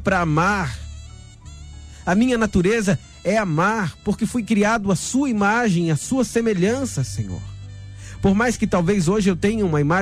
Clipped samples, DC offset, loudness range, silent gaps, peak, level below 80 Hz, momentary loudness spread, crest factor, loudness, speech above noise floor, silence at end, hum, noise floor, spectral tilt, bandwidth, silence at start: under 0.1%; under 0.1%; 2 LU; none; -6 dBFS; -40 dBFS; 19 LU; 14 dB; -20 LUFS; 20 dB; 0 s; none; -39 dBFS; -6 dB/octave; 14 kHz; 0 s